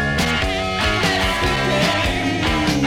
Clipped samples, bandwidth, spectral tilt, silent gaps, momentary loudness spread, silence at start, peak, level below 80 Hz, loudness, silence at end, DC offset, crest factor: under 0.1%; 16.5 kHz; -4.5 dB/octave; none; 2 LU; 0 s; -6 dBFS; -30 dBFS; -18 LUFS; 0 s; under 0.1%; 14 dB